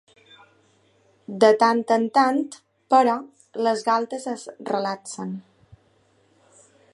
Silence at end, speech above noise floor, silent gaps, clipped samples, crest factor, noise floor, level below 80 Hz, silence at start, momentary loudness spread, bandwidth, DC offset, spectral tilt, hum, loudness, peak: 1.55 s; 41 dB; none; under 0.1%; 20 dB; -62 dBFS; -72 dBFS; 1.3 s; 16 LU; 11.5 kHz; under 0.1%; -4.5 dB/octave; none; -22 LUFS; -4 dBFS